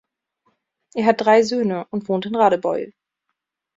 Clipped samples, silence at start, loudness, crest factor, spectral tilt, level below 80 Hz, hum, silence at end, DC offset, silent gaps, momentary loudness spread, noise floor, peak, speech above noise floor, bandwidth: under 0.1%; 0.95 s; -19 LUFS; 18 dB; -5.5 dB/octave; -66 dBFS; none; 0.85 s; under 0.1%; none; 12 LU; -78 dBFS; -2 dBFS; 60 dB; 7.8 kHz